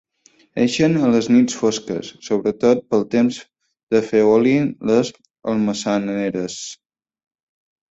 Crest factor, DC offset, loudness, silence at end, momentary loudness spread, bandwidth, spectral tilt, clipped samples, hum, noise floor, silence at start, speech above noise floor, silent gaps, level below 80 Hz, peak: 16 dB; under 0.1%; -18 LUFS; 1.15 s; 13 LU; 8 kHz; -5.5 dB/octave; under 0.1%; none; -56 dBFS; 0.55 s; 39 dB; 3.83-3.87 s; -58 dBFS; -2 dBFS